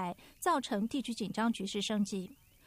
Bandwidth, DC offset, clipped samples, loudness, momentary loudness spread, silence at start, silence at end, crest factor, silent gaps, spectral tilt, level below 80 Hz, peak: 15.5 kHz; under 0.1%; under 0.1%; -35 LUFS; 8 LU; 0 s; 0.35 s; 16 dB; none; -4.5 dB/octave; -68 dBFS; -20 dBFS